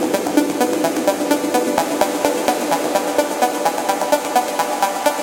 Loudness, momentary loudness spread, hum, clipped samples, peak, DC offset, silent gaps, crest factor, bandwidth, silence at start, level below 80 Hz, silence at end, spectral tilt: -18 LUFS; 2 LU; none; under 0.1%; 0 dBFS; under 0.1%; none; 18 dB; 17 kHz; 0 s; -60 dBFS; 0 s; -3 dB/octave